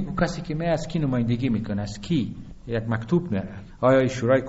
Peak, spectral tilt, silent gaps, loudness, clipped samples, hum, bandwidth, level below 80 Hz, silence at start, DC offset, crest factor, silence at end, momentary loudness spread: -6 dBFS; -6.5 dB/octave; none; -25 LUFS; under 0.1%; none; 8 kHz; -44 dBFS; 0 s; under 0.1%; 18 dB; 0 s; 10 LU